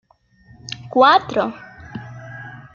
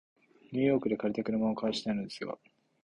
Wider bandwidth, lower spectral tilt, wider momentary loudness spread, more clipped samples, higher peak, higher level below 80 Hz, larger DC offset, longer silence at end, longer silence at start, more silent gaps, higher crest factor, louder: second, 7.4 kHz vs 10.5 kHz; second, -5 dB/octave vs -6.5 dB/octave; first, 23 LU vs 12 LU; neither; first, -2 dBFS vs -16 dBFS; first, -56 dBFS vs -66 dBFS; neither; second, 0.15 s vs 0.55 s; first, 0.65 s vs 0.5 s; neither; about the same, 20 dB vs 18 dB; first, -16 LUFS vs -32 LUFS